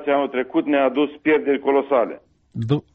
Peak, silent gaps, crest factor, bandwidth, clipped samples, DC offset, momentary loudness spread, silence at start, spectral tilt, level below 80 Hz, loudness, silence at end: -8 dBFS; none; 14 dB; 4.8 kHz; under 0.1%; under 0.1%; 10 LU; 0 s; -9 dB/octave; -62 dBFS; -20 LUFS; 0.15 s